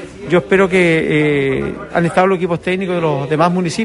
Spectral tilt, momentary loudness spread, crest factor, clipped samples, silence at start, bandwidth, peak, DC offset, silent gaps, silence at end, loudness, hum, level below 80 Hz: -6.5 dB/octave; 6 LU; 14 dB; under 0.1%; 0 s; 11.5 kHz; -2 dBFS; under 0.1%; none; 0 s; -15 LUFS; none; -44 dBFS